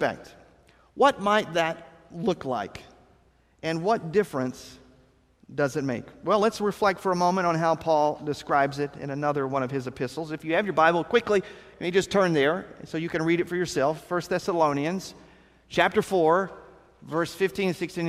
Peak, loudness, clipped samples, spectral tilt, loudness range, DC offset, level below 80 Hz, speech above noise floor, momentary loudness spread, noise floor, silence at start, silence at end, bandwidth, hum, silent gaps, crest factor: -6 dBFS; -26 LUFS; under 0.1%; -5.5 dB/octave; 5 LU; under 0.1%; -60 dBFS; 36 dB; 11 LU; -61 dBFS; 0 s; 0 s; 15 kHz; none; none; 22 dB